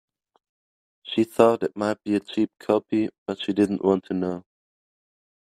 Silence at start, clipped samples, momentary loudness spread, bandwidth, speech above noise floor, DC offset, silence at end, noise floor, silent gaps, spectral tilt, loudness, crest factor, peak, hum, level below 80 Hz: 1.05 s; under 0.1%; 10 LU; 14 kHz; over 67 dB; under 0.1%; 1.1 s; under -90 dBFS; 3.18-3.26 s; -6.5 dB/octave; -24 LUFS; 24 dB; -2 dBFS; none; -68 dBFS